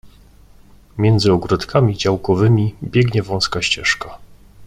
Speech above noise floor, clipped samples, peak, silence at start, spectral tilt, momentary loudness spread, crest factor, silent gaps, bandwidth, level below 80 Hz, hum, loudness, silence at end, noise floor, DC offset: 29 dB; under 0.1%; -2 dBFS; 0.05 s; -5.5 dB/octave; 5 LU; 16 dB; none; 11.5 kHz; -42 dBFS; 50 Hz at -40 dBFS; -17 LUFS; 0 s; -45 dBFS; under 0.1%